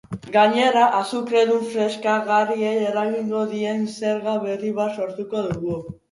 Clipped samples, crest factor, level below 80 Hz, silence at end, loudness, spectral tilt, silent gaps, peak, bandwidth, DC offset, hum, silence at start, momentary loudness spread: under 0.1%; 18 dB; -58 dBFS; 0.2 s; -21 LUFS; -5 dB/octave; none; -4 dBFS; 11.5 kHz; under 0.1%; none; 0.1 s; 9 LU